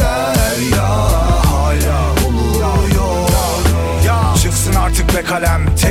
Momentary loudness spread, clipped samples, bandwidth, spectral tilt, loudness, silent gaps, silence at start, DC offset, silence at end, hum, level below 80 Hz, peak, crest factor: 2 LU; under 0.1%; 16.5 kHz; -5 dB/octave; -14 LUFS; none; 0 s; under 0.1%; 0 s; none; -16 dBFS; -2 dBFS; 12 dB